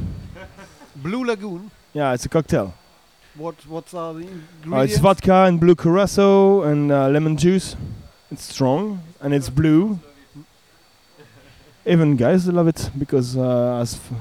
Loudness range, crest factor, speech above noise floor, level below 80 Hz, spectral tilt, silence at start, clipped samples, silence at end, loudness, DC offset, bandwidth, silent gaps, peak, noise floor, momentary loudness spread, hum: 9 LU; 18 dB; 37 dB; -44 dBFS; -7 dB/octave; 0 s; under 0.1%; 0 s; -18 LUFS; under 0.1%; 15 kHz; none; -2 dBFS; -55 dBFS; 20 LU; none